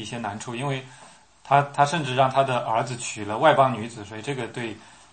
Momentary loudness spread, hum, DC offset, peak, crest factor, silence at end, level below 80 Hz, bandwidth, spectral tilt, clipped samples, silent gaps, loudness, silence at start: 14 LU; none; under 0.1%; -4 dBFS; 20 dB; 0.3 s; -66 dBFS; 8.8 kHz; -5 dB/octave; under 0.1%; none; -24 LUFS; 0 s